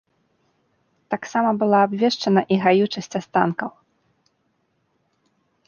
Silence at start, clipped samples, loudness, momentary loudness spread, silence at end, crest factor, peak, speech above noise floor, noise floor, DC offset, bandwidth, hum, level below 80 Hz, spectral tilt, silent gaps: 1.1 s; under 0.1%; -20 LUFS; 12 LU; 1.95 s; 20 dB; -2 dBFS; 49 dB; -69 dBFS; under 0.1%; 7.2 kHz; none; -68 dBFS; -6 dB/octave; none